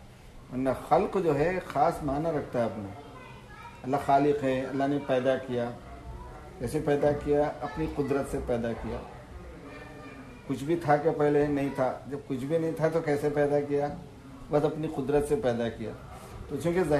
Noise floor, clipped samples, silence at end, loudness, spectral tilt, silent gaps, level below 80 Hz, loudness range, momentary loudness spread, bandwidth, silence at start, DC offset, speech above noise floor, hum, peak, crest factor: -49 dBFS; under 0.1%; 0 s; -29 LUFS; -7 dB/octave; none; -50 dBFS; 3 LU; 19 LU; 13.5 kHz; 0 s; under 0.1%; 21 dB; none; -10 dBFS; 18 dB